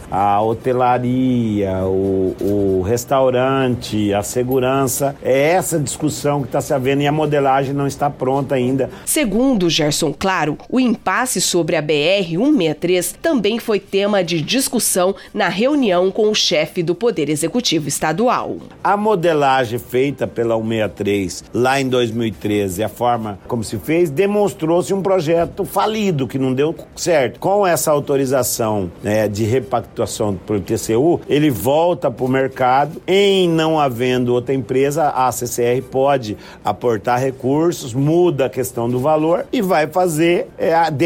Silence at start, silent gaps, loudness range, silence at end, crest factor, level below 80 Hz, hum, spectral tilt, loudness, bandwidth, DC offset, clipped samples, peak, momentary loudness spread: 0 s; none; 2 LU; 0 s; 12 dB; -46 dBFS; none; -5 dB/octave; -17 LUFS; 17 kHz; under 0.1%; under 0.1%; -4 dBFS; 5 LU